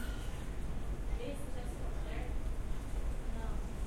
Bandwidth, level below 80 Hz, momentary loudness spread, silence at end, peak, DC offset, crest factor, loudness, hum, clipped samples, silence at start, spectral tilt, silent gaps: 15 kHz; -38 dBFS; 2 LU; 0 s; -24 dBFS; under 0.1%; 12 dB; -43 LUFS; none; under 0.1%; 0 s; -6 dB/octave; none